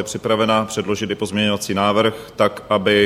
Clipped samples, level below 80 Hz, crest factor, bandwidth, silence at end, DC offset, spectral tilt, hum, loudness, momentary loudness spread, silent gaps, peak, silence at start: under 0.1%; -54 dBFS; 16 dB; 16 kHz; 0 s; under 0.1%; -4.5 dB/octave; none; -19 LUFS; 6 LU; none; -2 dBFS; 0 s